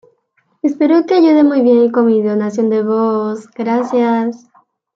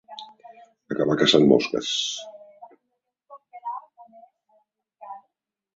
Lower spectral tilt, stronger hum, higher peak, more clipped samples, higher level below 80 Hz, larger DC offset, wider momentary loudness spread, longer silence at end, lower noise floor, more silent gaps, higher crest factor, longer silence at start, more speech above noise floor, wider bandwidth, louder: first, -7.5 dB/octave vs -4.5 dB/octave; neither; about the same, -2 dBFS vs -2 dBFS; neither; about the same, -66 dBFS vs -66 dBFS; neither; second, 10 LU vs 25 LU; about the same, 0.6 s vs 0.6 s; second, -62 dBFS vs -79 dBFS; neither; second, 12 dB vs 24 dB; first, 0.65 s vs 0.1 s; second, 49 dB vs 58 dB; about the same, 7.6 kHz vs 8 kHz; first, -13 LUFS vs -22 LUFS